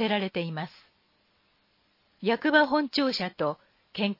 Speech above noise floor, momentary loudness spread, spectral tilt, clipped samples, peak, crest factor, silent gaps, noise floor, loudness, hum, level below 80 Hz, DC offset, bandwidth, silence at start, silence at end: 42 dB; 17 LU; -6 dB/octave; under 0.1%; -8 dBFS; 20 dB; none; -69 dBFS; -27 LUFS; none; -72 dBFS; under 0.1%; 5.8 kHz; 0 s; 0.05 s